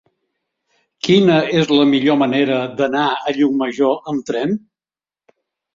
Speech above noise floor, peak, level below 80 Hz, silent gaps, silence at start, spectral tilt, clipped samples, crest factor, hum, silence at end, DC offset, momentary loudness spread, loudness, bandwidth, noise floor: over 75 dB; -2 dBFS; -60 dBFS; none; 1.05 s; -6 dB/octave; under 0.1%; 16 dB; none; 1.15 s; under 0.1%; 9 LU; -16 LUFS; 7.6 kHz; under -90 dBFS